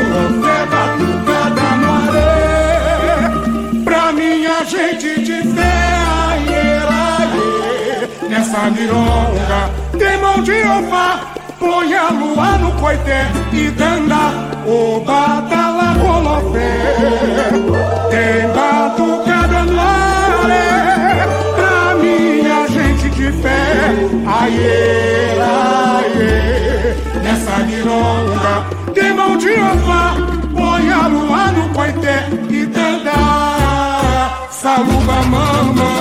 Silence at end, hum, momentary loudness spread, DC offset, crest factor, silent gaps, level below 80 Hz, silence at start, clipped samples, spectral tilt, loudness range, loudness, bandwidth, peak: 0 s; none; 4 LU; under 0.1%; 10 dB; none; -22 dBFS; 0 s; under 0.1%; -5.5 dB/octave; 2 LU; -13 LUFS; 15.5 kHz; -2 dBFS